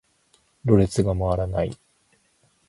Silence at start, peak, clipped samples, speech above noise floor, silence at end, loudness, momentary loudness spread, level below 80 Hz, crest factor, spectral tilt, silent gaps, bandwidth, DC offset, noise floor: 0.65 s; -4 dBFS; under 0.1%; 43 dB; 0.95 s; -23 LUFS; 11 LU; -40 dBFS; 22 dB; -8 dB/octave; none; 11.5 kHz; under 0.1%; -64 dBFS